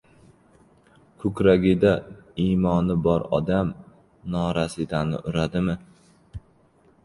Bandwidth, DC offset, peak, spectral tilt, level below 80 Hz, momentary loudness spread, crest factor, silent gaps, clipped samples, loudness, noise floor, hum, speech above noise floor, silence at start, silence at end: 11.5 kHz; under 0.1%; -4 dBFS; -7.5 dB/octave; -44 dBFS; 21 LU; 20 dB; none; under 0.1%; -23 LUFS; -58 dBFS; none; 36 dB; 1.2 s; 0.65 s